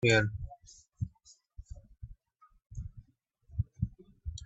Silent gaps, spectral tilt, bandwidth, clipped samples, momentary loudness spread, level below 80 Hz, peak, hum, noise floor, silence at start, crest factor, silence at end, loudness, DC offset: none; -5 dB/octave; 8.2 kHz; under 0.1%; 21 LU; -50 dBFS; -14 dBFS; none; -67 dBFS; 0 s; 24 dB; 0 s; -36 LUFS; under 0.1%